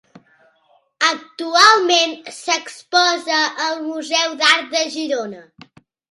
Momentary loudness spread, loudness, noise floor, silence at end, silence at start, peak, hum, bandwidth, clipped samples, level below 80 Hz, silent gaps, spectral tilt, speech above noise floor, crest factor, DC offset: 13 LU; -16 LUFS; -59 dBFS; 0.7 s; 1 s; 0 dBFS; none; 16 kHz; under 0.1%; -72 dBFS; none; 0 dB/octave; 41 dB; 20 dB; under 0.1%